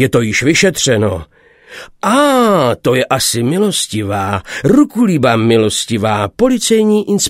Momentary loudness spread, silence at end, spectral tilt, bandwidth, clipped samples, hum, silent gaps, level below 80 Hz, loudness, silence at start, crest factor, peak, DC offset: 7 LU; 0 s; -4.5 dB/octave; 16.5 kHz; under 0.1%; none; none; -44 dBFS; -12 LUFS; 0 s; 12 dB; 0 dBFS; under 0.1%